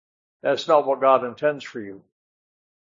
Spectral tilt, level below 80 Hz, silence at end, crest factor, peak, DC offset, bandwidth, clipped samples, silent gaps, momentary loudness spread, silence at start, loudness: -5 dB/octave; -80 dBFS; 0.9 s; 20 dB; -4 dBFS; under 0.1%; 7.6 kHz; under 0.1%; none; 17 LU; 0.45 s; -21 LUFS